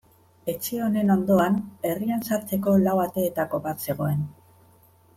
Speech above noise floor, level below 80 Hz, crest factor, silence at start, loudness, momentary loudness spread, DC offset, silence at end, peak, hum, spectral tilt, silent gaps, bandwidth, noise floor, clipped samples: 33 dB; -64 dBFS; 16 dB; 0.45 s; -25 LUFS; 9 LU; under 0.1%; 0.85 s; -8 dBFS; none; -7 dB/octave; none; 16.5 kHz; -57 dBFS; under 0.1%